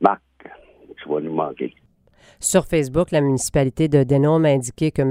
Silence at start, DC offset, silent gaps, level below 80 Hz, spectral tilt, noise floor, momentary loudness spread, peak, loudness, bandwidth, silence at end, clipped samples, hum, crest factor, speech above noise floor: 0 s; under 0.1%; none; -44 dBFS; -6 dB/octave; -54 dBFS; 11 LU; 0 dBFS; -19 LUFS; 16 kHz; 0 s; under 0.1%; none; 20 dB; 35 dB